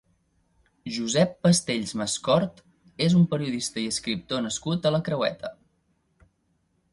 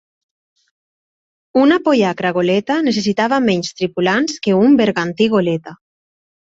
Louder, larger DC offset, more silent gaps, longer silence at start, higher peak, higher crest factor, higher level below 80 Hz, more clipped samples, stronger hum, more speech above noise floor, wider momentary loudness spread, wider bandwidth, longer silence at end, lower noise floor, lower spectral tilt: second, -25 LUFS vs -15 LUFS; neither; neither; second, 0.85 s vs 1.55 s; second, -6 dBFS vs -2 dBFS; first, 20 dB vs 14 dB; about the same, -60 dBFS vs -58 dBFS; neither; neither; second, 46 dB vs over 75 dB; first, 11 LU vs 7 LU; first, 11.5 kHz vs 8 kHz; first, 1.4 s vs 0.85 s; second, -71 dBFS vs under -90 dBFS; about the same, -5 dB/octave vs -5.5 dB/octave